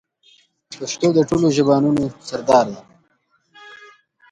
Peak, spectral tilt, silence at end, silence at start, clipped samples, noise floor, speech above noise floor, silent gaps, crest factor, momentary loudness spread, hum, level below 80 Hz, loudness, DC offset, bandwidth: -2 dBFS; -6 dB/octave; 0.55 s; 0.7 s; under 0.1%; -64 dBFS; 47 dB; none; 18 dB; 14 LU; none; -54 dBFS; -18 LUFS; under 0.1%; 11 kHz